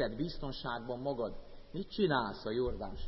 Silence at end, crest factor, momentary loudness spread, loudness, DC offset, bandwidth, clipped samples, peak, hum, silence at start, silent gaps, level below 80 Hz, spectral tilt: 0 s; 18 dB; 11 LU; -37 LUFS; under 0.1%; 5.8 kHz; under 0.1%; -18 dBFS; none; 0 s; none; -50 dBFS; -4.5 dB/octave